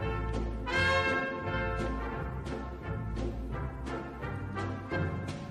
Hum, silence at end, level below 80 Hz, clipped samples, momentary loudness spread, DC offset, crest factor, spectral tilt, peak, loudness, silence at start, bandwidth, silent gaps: none; 0 s; -40 dBFS; under 0.1%; 11 LU; under 0.1%; 18 dB; -6 dB/octave; -16 dBFS; -34 LUFS; 0 s; 11.5 kHz; none